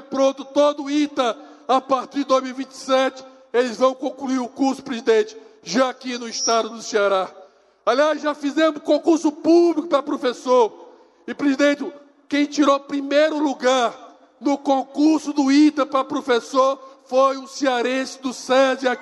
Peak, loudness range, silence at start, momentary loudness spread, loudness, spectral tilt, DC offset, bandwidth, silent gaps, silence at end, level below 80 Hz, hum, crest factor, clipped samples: -6 dBFS; 3 LU; 0 s; 8 LU; -20 LUFS; -3 dB/octave; under 0.1%; 11.5 kHz; none; 0 s; -76 dBFS; none; 14 dB; under 0.1%